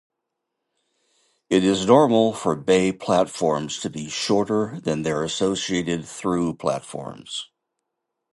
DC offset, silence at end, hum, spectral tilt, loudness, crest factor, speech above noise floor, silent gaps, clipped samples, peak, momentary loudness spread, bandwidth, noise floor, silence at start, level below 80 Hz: under 0.1%; 0.9 s; none; -5 dB/octave; -22 LUFS; 20 dB; 59 dB; none; under 0.1%; -2 dBFS; 14 LU; 11.5 kHz; -81 dBFS; 1.5 s; -56 dBFS